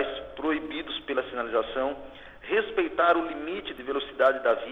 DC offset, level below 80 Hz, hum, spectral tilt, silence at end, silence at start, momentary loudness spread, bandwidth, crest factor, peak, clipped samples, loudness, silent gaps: under 0.1%; -56 dBFS; none; -5.5 dB/octave; 0 s; 0 s; 11 LU; 6 kHz; 18 dB; -8 dBFS; under 0.1%; -28 LUFS; none